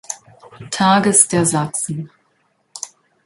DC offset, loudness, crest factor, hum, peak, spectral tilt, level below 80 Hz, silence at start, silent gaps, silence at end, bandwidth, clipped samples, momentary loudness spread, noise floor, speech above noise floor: under 0.1%; -15 LUFS; 20 dB; none; 0 dBFS; -3.5 dB/octave; -58 dBFS; 0.1 s; none; 0.4 s; 12 kHz; under 0.1%; 20 LU; -63 dBFS; 47 dB